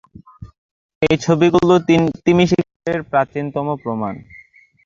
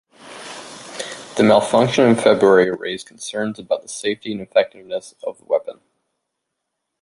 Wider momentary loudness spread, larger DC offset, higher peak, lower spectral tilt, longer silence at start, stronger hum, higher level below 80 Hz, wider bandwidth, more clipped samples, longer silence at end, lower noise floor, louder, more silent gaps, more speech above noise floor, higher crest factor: second, 10 LU vs 20 LU; neither; about the same, -2 dBFS vs -2 dBFS; first, -6.5 dB/octave vs -5 dB/octave; first, 0.4 s vs 0.25 s; neither; first, -48 dBFS vs -60 dBFS; second, 7.4 kHz vs 11.5 kHz; neither; second, 0.5 s vs 1.3 s; second, -47 dBFS vs -78 dBFS; about the same, -17 LUFS vs -18 LUFS; first, 0.58-0.89 s, 0.95-1.01 s, 2.76-2.80 s vs none; second, 31 dB vs 60 dB; about the same, 16 dB vs 18 dB